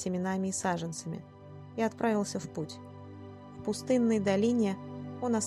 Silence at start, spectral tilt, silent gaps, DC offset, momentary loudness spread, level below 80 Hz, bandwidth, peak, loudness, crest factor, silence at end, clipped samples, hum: 0 s; -5.5 dB/octave; none; under 0.1%; 20 LU; -68 dBFS; 12.5 kHz; -14 dBFS; -32 LUFS; 16 dB; 0 s; under 0.1%; 50 Hz at -55 dBFS